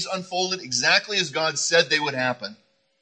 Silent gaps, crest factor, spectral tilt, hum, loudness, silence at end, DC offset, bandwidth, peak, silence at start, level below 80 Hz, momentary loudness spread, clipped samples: none; 20 dB; -1.5 dB/octave; none; -21 LUFS; 0.5 s; under 0.1%; 9.8 kHz; -4 dBFS; 0 s; -74 dBFS; 8 LU; under 0.1%